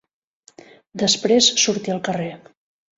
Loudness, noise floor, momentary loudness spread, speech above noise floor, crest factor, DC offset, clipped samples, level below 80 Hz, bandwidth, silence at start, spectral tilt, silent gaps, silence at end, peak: -18 LUFS; -47 dBFS; 15 LU; 28 dB; 20 dB; under 0.1%; under 0.1%; -64 dBFS; 8 kHz; 0.95 s; -2.5 dB/octave; none; 0.6 s; -2 dBFS